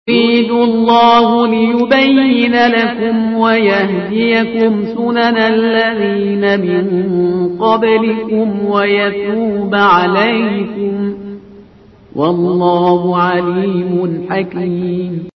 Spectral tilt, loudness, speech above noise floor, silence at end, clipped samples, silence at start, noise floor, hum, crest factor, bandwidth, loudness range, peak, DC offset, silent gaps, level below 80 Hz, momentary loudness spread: -7.5 dB/octave; -12 LUFS; 29 dB; 0.05 s; under 0.1%; 0.05 s; -41 dBFS; none; 12 dB; 6 kHz; 4 LU; 0 dBFS; under 0.1%; none; -50 dBFS; 8 LU